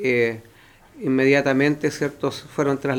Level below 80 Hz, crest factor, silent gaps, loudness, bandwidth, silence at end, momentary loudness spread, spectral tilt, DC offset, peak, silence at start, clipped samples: -58 dBFS; 18 dB; none; -21 LUFS; 17.5 kHz; 0 s; 10 LU; -6 dB/octave; under 0.1%; -4 dBFS; 0 s; under 0.1%